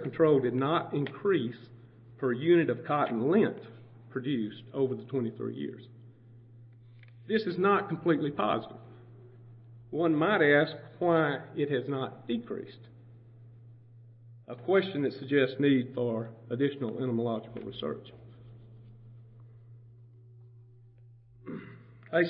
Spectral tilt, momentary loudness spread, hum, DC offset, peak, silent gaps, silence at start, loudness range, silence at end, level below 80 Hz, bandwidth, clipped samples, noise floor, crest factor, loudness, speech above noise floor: -10.5 dB/octave; 18 LU; none; under 0.1%; -10 dBFS; none; 0 s; 9 LU; 0 s; -72 dBFS; 5.6 kHz; under 0.1%; -56 dBFS; 20 dB; -30 LUFS; 27 dB